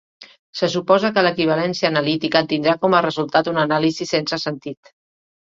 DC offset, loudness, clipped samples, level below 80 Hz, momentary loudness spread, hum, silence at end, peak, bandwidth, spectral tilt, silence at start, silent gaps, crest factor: under 0.1%; -18 LUFS; under 0.1%; -62 dBFS; 8 LU; none; 0.7 s; 0 dBFS; 7.8 kHz; -5 dB/octave; 0.2 s; 0.39-0.53 s; 18 dB